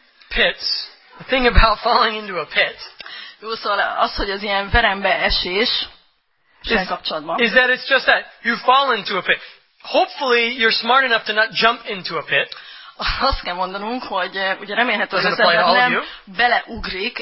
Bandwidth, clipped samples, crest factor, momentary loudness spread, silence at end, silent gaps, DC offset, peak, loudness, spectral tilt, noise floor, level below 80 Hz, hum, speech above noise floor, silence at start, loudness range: 5.8 kHz; under 0.1%; 18 dB; 11 LU; 0 s; none; under 0.1%; 0 dBFS; -18 LUFS; -7 dB/octave; -62 dBFS; -32 dBFS; none; 44 dB; 0.3 s; 3 LU